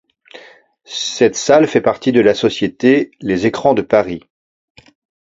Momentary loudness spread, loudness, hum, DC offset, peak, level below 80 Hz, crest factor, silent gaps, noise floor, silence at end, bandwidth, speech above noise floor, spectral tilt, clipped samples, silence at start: 10 LU; -14 LUFS; none; under 0.1%; 0 dBFS; -52 dBFS; 16 dB; none; -45 dBFS; 1 s; 7.8 kHz; 31 dB; -4.5 dB/octave; under 0.1%; 0.35 s